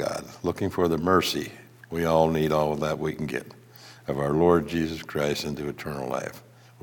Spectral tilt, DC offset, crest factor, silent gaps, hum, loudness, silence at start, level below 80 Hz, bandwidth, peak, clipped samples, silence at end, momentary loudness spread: -5.5 dB/octave; under 0.1%; 20 dB; none; none; -26 LUFS; 0 s; -54 dBFS; 18 kHz; -6 dBFS; under 0.1%; 0.4 s; 12 LU